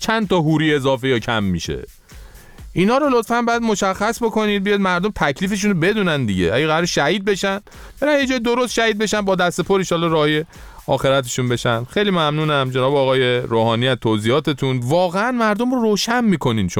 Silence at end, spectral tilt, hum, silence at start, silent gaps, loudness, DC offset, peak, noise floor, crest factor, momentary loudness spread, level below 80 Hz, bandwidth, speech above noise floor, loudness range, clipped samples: 0 s; -5 dB/octave; none; 0 s; none; -18 LUFS; under 0.1%; -4 dBFS; -40 dBFS; 14 dB; 4 LU; -44 dBFS; 18 kHz; 22 dB; 2 LU; under 0.1%